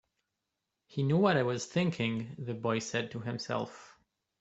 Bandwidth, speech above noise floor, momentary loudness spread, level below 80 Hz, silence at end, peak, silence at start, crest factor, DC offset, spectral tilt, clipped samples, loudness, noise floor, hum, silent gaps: 8.2 kHz; 54 dB; 11 LU; -70 dBFS; 0.5 s; -12 dBFS; 0.9 s; 22 dB; under 0.1%; -5.5 dB/octave; under 0.1%; -32 LUFS; -86 dBFS; none; none